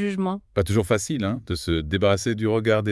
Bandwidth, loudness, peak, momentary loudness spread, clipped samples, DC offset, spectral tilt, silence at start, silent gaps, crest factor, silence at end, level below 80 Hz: 12 kHz; -23 LUFS; -6 dBFS; 6 LU; under 0.1%; under 0.1%; -5.5 dB/octave; 0 s; none; 18 dB; 0 s; -46 dBFS